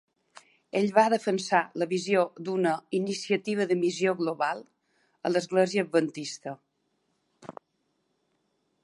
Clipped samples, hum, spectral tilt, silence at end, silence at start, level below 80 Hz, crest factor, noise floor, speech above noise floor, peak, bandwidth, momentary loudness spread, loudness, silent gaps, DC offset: under 0.1%; none; -5 dB/octave; 1.3 s; 0.75 s; -80 dBFS; 22 dB; -76 dBFS; 49 dB; -8 dBFS; 11.5 kHz; 14 LU; -27 LUFS; none; under 0.1%